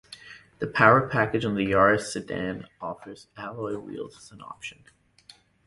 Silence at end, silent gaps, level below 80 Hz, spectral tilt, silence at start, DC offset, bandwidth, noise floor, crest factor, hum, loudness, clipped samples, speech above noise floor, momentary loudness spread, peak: 0.95 s; none; -56 dBFS; -5.5 dB/octave; 0.1 s; under 0.1%; 11.5 kHz; -56 dBFS; 24 dB; none; -24 LUFS; under 0.1%; 30 dB; 23 LU; -2 dBFS